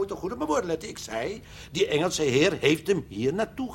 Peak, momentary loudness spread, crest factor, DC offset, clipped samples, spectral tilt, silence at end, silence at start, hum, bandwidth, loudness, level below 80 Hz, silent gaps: -6 dBFS; 11 LU; 22 dB; under 0.1%; under 0.1%; -4.5 dB/octave; 0 s; 0 s; none; 16.5 kHz; -26 LUFS; -52 dBFS; none